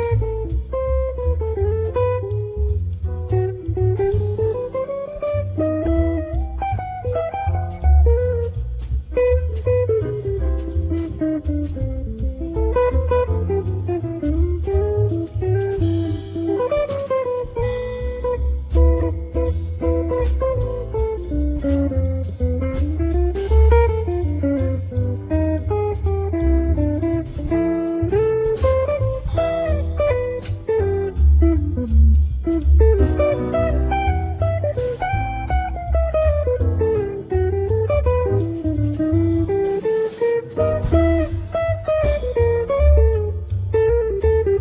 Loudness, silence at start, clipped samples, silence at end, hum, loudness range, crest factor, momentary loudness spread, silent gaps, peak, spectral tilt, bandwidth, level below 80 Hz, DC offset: -20 LUFS; 0 s; under 0.1%; 0 s; none; 4 LU; 14 dB; 7 LU; none; -4 dBFS; -12.5 dB/octave; 3.9 kHz; -22 dBFS; under 0.1%